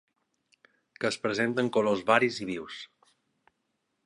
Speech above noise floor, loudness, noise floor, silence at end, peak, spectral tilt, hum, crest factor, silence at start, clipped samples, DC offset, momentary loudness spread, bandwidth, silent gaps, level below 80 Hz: 51 dB; -28 LUFS; -79 dBFS; 1.2 s; -6 dBFS; -4.5 dB/octave; none; 26 dB; 1 s; under 0.1%; under 0.1%; 17 LU; 11.5 kHz; none; -72 dBFS